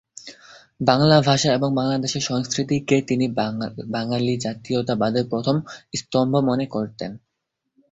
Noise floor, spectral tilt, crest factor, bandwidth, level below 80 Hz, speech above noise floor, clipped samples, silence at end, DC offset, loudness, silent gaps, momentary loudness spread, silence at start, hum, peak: -78 dBFS; -5.5 dB/octave; 20 dB; 8 kHz; -56 dBFS; 57 dB; under 0.1%; 0.75 s; under 0.1%; -21 LUFS; none; 13 LU; 0.25 s; none; -2 dBFS